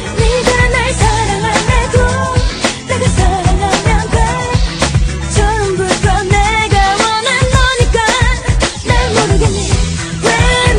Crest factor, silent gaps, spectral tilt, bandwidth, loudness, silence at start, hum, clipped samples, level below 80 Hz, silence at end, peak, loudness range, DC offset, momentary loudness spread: 12 dB; none; -4 dB/octave; 10.5 kHz; -12 LUFS; 0 s; none; under 0.1%; -16 dBFS; 0 s; 0 dBFS; 2 LU; under 0.1%; 4 LU